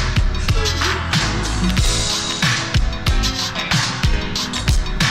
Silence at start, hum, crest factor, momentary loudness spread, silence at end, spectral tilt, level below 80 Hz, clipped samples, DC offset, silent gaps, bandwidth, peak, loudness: 0 s; none; 14 dB; 3 LU; 0 s; -3.5 dB/octave; -22 dBFS; under 0.1%; under 0.1%; none; 15.5 kHz; -4 dBFS; -19 LUFS